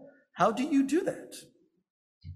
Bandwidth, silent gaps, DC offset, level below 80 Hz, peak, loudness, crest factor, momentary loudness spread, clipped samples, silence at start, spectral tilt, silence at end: 13 kHz; 1.90-2.21 s; under 0.1%; -68 dBFS; -12 dBFS; -28 LUFS; 20 dB; 21 LU; under 0.1%; 0 s; -5.5 dB/octave; 0 s